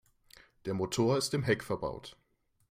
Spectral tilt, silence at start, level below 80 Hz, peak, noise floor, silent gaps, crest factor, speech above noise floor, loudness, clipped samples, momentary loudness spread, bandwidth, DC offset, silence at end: -5 dB/octave; 0.65 s; -62 dBFS; -14 dBFS; -61 dBFS; none; 20 dB; 29 dB; -32 LUFS; under 0.1%; 16 LU; 16 kHz; under 0.1%; 0.6 s